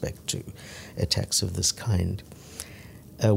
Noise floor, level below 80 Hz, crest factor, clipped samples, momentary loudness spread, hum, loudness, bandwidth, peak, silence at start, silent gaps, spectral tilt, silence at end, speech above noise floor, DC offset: -45 dBFS; -46 dBFS; 20 dB; under 0.1%; 18 LU; none; -27 LUFS; 16 kHz; -8 dBFS; 0 s; none; -4 dB/octave; 0 s; 17 dB; under 0.1%